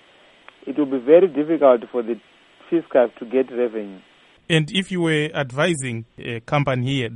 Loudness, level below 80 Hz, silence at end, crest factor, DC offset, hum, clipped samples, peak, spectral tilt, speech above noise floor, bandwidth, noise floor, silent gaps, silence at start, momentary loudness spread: -20 LUFS; -58 dBFS; 0 s; 18 dB; under 0.1%; none; under 0.1%; -2 dBFS; -6 dB/octave; 30 dB; 11.5 kHz; -50 dBFS; none; 0.65 s; 16 LU